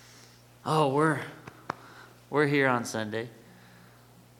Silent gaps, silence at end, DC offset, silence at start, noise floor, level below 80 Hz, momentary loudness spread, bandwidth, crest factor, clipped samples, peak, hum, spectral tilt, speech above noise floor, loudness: none; 1.05 s; under 0.1%; 0.65 s; -55 dBFS; -70 dBFS; 18 LU; 18 kHz; 22 dB; under 0.1%; -10 dBFS; none; -5.5 dB/octave; 29 dB; -28 LUFS